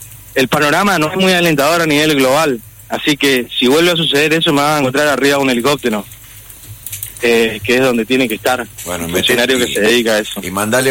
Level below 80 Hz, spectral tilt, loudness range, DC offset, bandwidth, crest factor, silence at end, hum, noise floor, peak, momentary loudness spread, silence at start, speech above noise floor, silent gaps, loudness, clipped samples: -46 dBFS; -3.5 dB/octave; 3 LU; under 0.1%; 17 kHz; 12 dB; 0 s; none; -36 dBFS; -2 dBFS; 11 LU; 0 s; 23 dB; none; -13 LUFS; under 0.1%